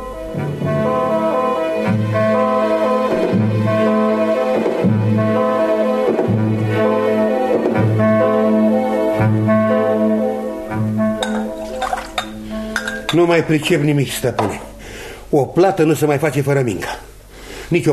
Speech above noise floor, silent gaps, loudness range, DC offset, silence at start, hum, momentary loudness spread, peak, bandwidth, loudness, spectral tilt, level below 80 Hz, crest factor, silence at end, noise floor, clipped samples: 21 dB; none; 3 LU; under 0.1%; 0 s; none; 9 LU; -2 dBFS; 13.5 kHz; -17 LUFS; -6.5 dB/octave; -44 dBFS; 14 dB; 0 s; -36 dBFS; under 0.1%